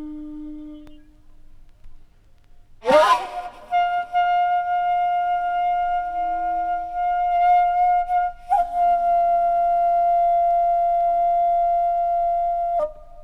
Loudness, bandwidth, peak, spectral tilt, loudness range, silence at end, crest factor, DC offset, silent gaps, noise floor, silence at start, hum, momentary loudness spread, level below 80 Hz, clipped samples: -20 LUFS; 10.5 kHz; -4 dBFS; -4 dB/octave; 4 LU; 0 s; 18 dB; under 0.1%; none; -49 dBFS; 0 s; none; 8 LU; -44 dBFS; under 0.1%